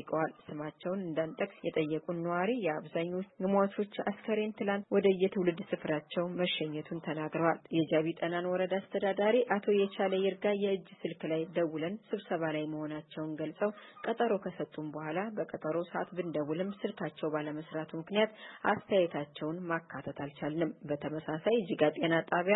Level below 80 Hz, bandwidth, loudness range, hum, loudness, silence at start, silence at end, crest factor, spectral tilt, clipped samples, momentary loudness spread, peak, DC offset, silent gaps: -76 dBFS; 4.1 kHz; 5 LU; none; -34 LUFS; 0 s; 0 s; 20 dB; -10 dB/octave; under 0.1%; 9 LU; -14 dBFS; under 0.1%; none